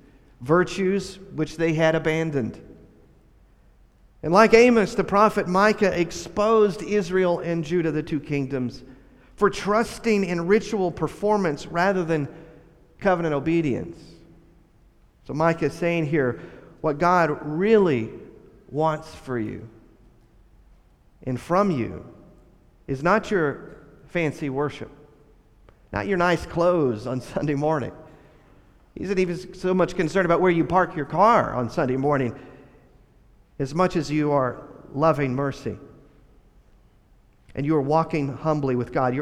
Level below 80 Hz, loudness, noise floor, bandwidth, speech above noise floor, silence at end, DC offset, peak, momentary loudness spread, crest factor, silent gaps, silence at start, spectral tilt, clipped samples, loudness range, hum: -50 dBFS; -23 LUFS; -56 dBFS; 13 kHz; 34 dB; 0 s; under 0.1%; -2 dBFS; 14 LU; 22 dB; none; 0.4 s; -6.5 dB/octave; under 0.1%; 7 LU; none